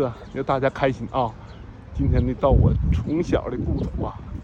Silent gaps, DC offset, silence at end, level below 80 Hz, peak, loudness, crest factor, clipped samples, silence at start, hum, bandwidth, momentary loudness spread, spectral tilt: none; under 0.1%; 0 s; -28 dBFS; -6 dBFS; -23 LUFS; 18 dB; under 0.1%; 0 s; none; 7.4 kHz; 12 LU; -8.5 dB/octave